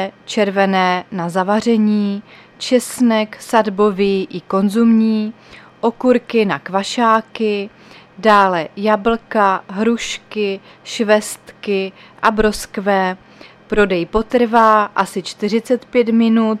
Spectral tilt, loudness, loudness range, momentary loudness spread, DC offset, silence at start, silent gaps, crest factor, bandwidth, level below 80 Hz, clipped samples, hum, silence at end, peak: -5 dB/octave; -16 LUFS; 3 LU; 9 LU; under 0.1%; 0 s; none; 16 dB; 14.5 kHz; -42 dBFS; under 0.1%; none; 0 s; 0 dBFS